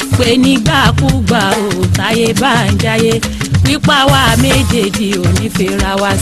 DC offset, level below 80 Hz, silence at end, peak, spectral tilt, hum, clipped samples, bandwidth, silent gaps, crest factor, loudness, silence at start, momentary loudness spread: under 0.1%; -26 dBFS; 0 s; 0 dBFS; -4.5 dB/octave; none; under 0.1%; 13.5 kHz; none; 10 dB; -11 LUFS; 0 s; 5 LU